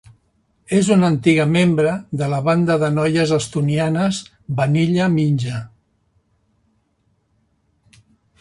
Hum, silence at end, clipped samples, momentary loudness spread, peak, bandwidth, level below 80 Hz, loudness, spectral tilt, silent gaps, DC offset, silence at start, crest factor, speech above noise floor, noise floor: none; 2.75 s; under 0.1%; 7 LU; -2 dBFS; 11.5 kHz; -52 dBFS; -18 LUFS; -6.5 dB/octave; none; under 0.1%; 0.7 s; 18 dB; 48 dB; -65 dBFS